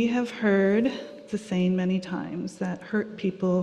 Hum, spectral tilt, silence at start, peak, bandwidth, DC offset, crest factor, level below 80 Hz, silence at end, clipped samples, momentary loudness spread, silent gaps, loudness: none; -7 dB/octave; 0 s; -10 dBFS; 10 kHz; under 0.1%; 16 dB; -64 dBFS; 0 s; under 0.1%; 12 LU; none; -27 LUFS